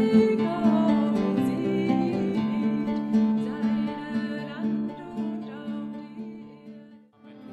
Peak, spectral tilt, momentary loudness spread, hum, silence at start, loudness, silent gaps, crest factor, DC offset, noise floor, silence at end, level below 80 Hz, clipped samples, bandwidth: -10 dBFS; -8 dB/octave; 16 LU; none; 0 s; -26 LUFS; none; 16 dB; under 0.1%; -50 dBFS; 0 s; -62 dBFS; under 0.1%; 8.2 kHz